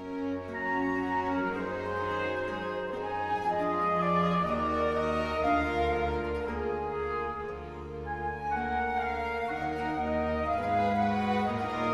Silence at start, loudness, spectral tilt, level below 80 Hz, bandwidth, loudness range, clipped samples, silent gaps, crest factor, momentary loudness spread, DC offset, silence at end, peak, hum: 0 s; -31 LUFS; -7 dB/octave; -46 dBFS; 13 kHz; 4 LU; under 0.1%; none; 14 dB; 7 LU; under 0.1%; 0 s; -16 dBFS; none